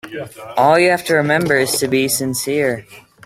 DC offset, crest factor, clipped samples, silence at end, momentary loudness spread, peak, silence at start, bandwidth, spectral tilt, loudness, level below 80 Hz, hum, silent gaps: under 0.1%; 16 dB; under 0.1%; 0.25 s; 13 LU; 0 dBFS; 0.05 s; 16.5 kHz; -4 dB/octave; -15 LUFS; -54 dBFS; none; none